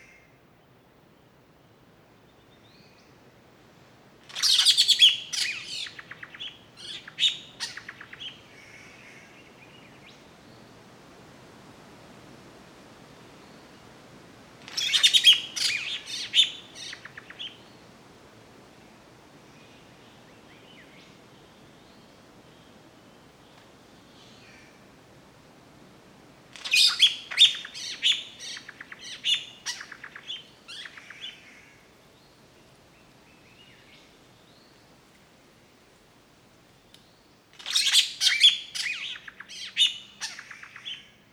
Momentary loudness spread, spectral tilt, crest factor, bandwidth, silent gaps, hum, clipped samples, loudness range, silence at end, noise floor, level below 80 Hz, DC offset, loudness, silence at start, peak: 25 LU; 1.5 dB/octave; 26 dB; 19 kHz; none; none; under 0.1%; 21 LU; 0.3 s; -58 dBFS; -70 dBFS; under 0.1%; -22 LUFS; 4.3 s; -4 dBFS